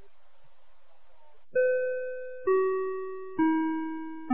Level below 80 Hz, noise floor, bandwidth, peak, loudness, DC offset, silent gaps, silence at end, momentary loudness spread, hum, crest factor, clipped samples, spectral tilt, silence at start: -70 dBFS; -65 dBFS; 3.8 kHz; -16 dBFS; -29 LUFS; 0.8%; none; 0 s; 10 LU; none; 16 dB; under 0.1%; -4.5 dB/octave; 1.55 s